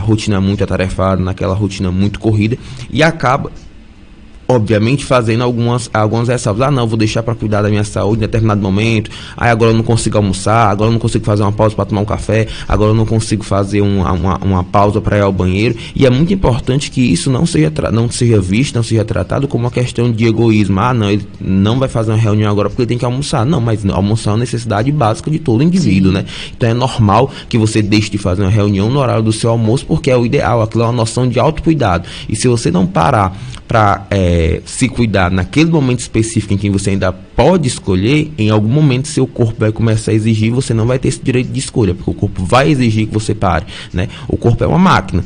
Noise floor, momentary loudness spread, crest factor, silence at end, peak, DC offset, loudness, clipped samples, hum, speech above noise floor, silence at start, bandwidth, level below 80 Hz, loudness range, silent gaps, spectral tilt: -36 dBFS; 5 LU; 12 dB; 0 s; 0 dBFS; under 0.1%; -13 LUFS; under 0.1%; none; 24 dB; 0 s; 10 kHz; -30 dBFS; 2 LU; none; -6.5 dB/octave